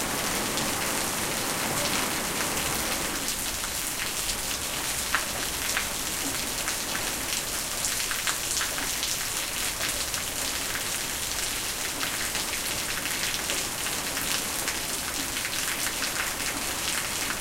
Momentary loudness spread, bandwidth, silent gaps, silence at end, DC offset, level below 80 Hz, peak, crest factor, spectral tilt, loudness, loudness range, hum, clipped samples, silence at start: 2 LU; 17 kHz; none; 0 s; under 0.1%; -46 dBFS; -6 dBFS; 24 dB; -1 dB/octave; -27 LUFS; 1 LU; none; under 0.1%; 0 s